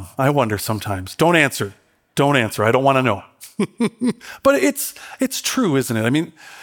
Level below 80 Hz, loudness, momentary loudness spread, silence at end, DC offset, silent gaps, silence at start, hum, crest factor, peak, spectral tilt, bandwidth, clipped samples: -58 dBFS; -19 LUFS; 11 LU; 0 s; under 0.1%; none; 0 s; none; 18 dB; 0 dBFS; -5 dB/octave; 18.5 kHz; under 0.1%